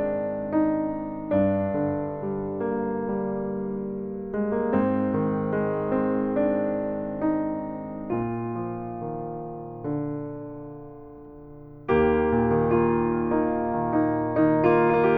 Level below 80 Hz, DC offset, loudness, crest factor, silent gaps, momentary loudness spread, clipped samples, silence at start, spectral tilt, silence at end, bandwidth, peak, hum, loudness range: -48 dBFS; under 0.1%; -26 LUFS; 18 dB; none; 14 LU; under 0.1%; 0 s; -11 dB/octave; 0 s; 4.7 kHz; -8 dBFS; none; 8 LU